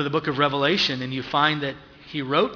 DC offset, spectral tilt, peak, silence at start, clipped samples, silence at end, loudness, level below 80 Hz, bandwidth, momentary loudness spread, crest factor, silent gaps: under 0.1%; -5 dB/octave; -4 dBFS; 0 s; under 0.1%; 0 s; -23 LUFS; -58 dBFS; 5.4 kHz; 12 LU; 20 dB; none